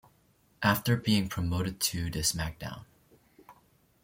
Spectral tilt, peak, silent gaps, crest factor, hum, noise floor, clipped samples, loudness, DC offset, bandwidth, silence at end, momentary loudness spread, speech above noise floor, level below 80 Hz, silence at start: -4 dB/octave; -10 dBFS; none; 22 dB; none; -66 dBFS; under 0.1%; -29 LUFS; under 0.1%; 17 kHz; 0.5 s; 13 LU; 37 dB; -52 dBFS; 0.6 s